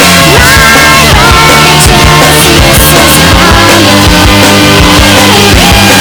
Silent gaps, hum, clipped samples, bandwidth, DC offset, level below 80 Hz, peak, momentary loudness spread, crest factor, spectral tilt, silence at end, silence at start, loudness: none; none; 50%; over 20 kHz; 1%; -14 dBFS; 0 dBFS; 1 LU; 2 dB; -3.5 dB/octave; 0 s; 0 s; -1 LUFS